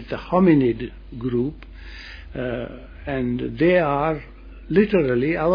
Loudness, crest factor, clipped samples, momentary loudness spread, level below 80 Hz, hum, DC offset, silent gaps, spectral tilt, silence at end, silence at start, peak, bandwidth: -21 LUFS; 18 dB; under 0.1%; 19 LU; -40 dBFS; none; under 0.1%; none; -9.5 dB/octave; 0 s; 0 s; -4 dBFS; 5.2 kHz